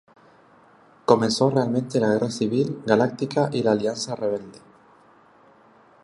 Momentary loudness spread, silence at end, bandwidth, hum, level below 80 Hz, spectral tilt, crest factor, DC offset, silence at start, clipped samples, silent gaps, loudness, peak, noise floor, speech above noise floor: 7 LU; 1.45 s; 11.5 kHz; none; -66 dBFS; -5.5 dB/octave; 22 dB; under 0.1%; 1.1 s; under 0.1%; none; -23 LUFS; -2 dBFS; -54 dBFS; 32 dB